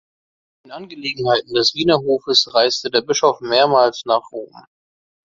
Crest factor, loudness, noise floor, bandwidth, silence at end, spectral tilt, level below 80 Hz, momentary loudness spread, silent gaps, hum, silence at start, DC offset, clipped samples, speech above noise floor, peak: 18 dB; -17 LUFS; under -90 dBFS; 7.6 kHz; 0.65 s; -3 dB/octave; -58 dBFS; 18 LU; none; none; 0.7 s; under 0.1%; under 0.1%; over 72 dB; 0 dBFS